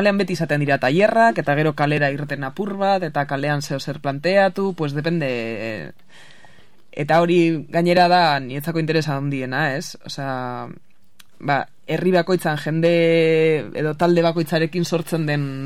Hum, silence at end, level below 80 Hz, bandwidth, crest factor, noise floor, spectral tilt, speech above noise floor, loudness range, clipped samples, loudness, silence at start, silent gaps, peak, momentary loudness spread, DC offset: none; 0 s; -62 dBFS; 15.5 kHz; 16 dB; -55 dBFS; -6.5 dB/octave; 35 dB; 5 LU; under 0.1%; -20 LUFS; 0 s; none; -4 dBFS; 11 LU; 0.9%